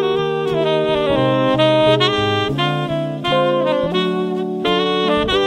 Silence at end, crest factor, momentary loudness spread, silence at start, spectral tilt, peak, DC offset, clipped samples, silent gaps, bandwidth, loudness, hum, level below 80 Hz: 0 s; 16 dB; 7 LU; 0 s; -6 dB/octave; -2 dBFS; under 0.1%; under 0.1%; none; 13 kHz; -17 LUFS; none; -44 dBFS